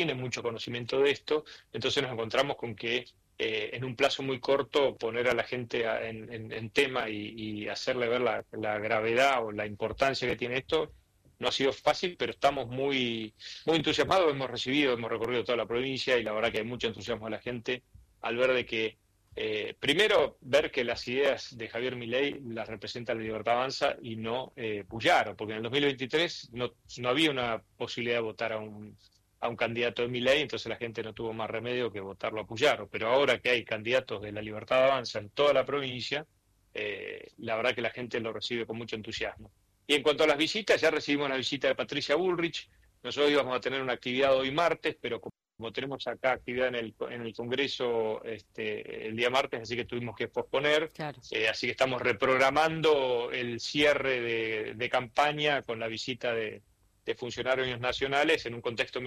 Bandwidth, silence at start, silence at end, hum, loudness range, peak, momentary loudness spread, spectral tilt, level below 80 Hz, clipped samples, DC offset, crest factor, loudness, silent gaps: 15 kHz; 0 s; 0 s; none; 5 LU; -12 dBFS; 11 LU; -4 dB/octave; -62 dBFS; under 0.1%; under 0.1%; 18 dB; -30 LUFS; none